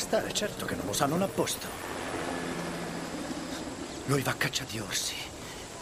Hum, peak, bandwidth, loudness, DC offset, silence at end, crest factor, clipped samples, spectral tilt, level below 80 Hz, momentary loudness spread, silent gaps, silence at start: none; -10 dBFS; 15.5 kHz; -32 LUFS; under 0.1%; 0 s; 22 dB; under 0.1%; -3.5 dB/octave; -54 dBFS; 9 LU; none; 0 s